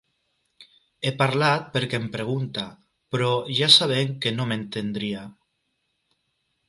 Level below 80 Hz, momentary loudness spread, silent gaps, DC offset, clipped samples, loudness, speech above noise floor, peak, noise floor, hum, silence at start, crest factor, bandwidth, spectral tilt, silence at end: -64 dBFS; 16 LU; none; under 0.1%; under 0.1%; -22 LUFS; 51 dB; -2 dBFS; -75 dBFS; none; 0.6 s; 24 dB; 11.5 kHz; -4.5 dB/octave; 1.35 s